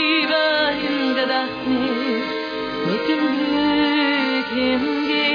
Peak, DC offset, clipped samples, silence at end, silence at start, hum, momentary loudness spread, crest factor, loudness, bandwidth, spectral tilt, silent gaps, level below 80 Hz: -8 dBFS; under 0.1%; under 0.1%; 0 s; 0 s; none; 6 LU; 12 dB; -20 LUFS; 5.2 kHz; -5.5 dB/octave; none; -54 dBFS